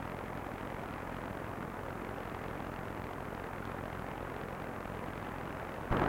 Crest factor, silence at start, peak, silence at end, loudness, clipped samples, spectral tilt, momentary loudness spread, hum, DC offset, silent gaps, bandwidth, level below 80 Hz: 20 dB; 0 s; -20 dBFS; 0 s; -42 LUFS; under 0.1%; -6.5 dB/octave; 1 LU; none; under 0.1%; none; 16.5 kHz; -52 dBFS